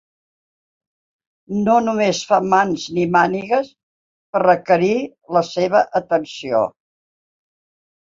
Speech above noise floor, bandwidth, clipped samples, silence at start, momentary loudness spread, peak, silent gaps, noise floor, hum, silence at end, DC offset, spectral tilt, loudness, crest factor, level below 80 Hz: over 73 dB; 7.8 kHz; under 0.1%; 1.5 s; 6 LU; -2 dBFS; 3.83-4.33 s; under -90 dBFS; none; 1.4 s; under 0.1%; -5.5 dB/octave; -18 LUFS; 18 dB; -60 dBFS